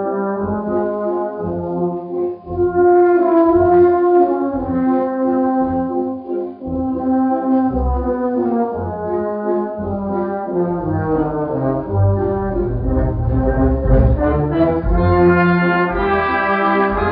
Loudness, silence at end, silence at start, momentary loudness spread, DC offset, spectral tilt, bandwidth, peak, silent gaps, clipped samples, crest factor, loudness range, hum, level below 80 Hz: -17 LUFS; 0 s; 0 s; 10 LU; under 0.1%; -8 dB/octave; 4.9 kHz; -2 dBFS; none; under 0.1%; 14 dB; 6 LU; none; -26 dBFS